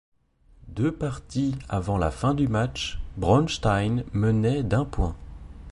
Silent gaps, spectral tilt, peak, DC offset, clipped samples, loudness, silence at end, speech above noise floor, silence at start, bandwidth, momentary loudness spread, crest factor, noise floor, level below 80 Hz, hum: none; -6.5 dB/octave; -8 dBFS; under 0.1%; under 0.1%; -26 LUFS; 0 s; 33 dB; 0.65 s; 11.5 kHz; 10 LU; 18 dB; -57 dBFS; -38 dBFS; none